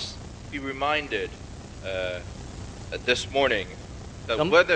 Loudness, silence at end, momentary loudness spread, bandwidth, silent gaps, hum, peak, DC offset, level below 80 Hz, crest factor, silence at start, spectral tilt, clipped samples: -27 LUFS; 0 s; 17 LU; 9.8 kHz; none; none; -2 dBFS; under 0.1%; -46 dBFS; 24 dB; 0 s; -4 dB/octave; under 0.1%